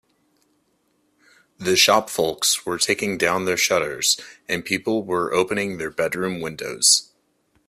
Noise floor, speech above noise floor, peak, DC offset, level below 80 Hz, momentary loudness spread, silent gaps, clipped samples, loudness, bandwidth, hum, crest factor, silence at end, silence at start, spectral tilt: -67 dBFS; 45 dB; -2 dBFS; under 0.1%; -60 dBFS; 11 LU; none; under 0.1%; -20 LUFS; 16 kHz; none; 20 dB; 0.65 s; 1.6 s; -2 dB/octave